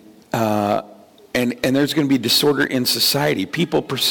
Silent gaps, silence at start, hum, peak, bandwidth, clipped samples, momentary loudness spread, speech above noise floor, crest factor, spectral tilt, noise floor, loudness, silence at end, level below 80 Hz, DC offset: none; 0.35 s; none; -8 dBFS; 17.5 kHz; under 0.1%; 7 LU; 27 dB; 12 dB; -4 dB/octave; -45 dBFS; -18 LUFS; 0 s; -54 dBFS; under 0.1%